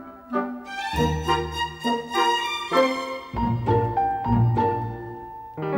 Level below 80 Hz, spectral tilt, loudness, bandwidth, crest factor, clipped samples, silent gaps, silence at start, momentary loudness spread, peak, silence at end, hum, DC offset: -40 dBFS; -6 dB/octave; -24 LUFS; 16.5 kHz; 16 dB; under 0.1%; none; 0 s; 11 LU; -8 dBFS; 0 s; none; under 0.1%